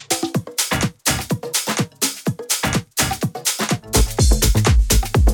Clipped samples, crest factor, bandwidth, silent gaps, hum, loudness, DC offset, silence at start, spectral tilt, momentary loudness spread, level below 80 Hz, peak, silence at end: under 0.1%; 16 dB; 19.5 kHz; none; none; -19 LUFS; under 0.1%; 0 s; -3.5 dB/octave; 6 LU; -22 dBFS; -2 dBFS; 0 s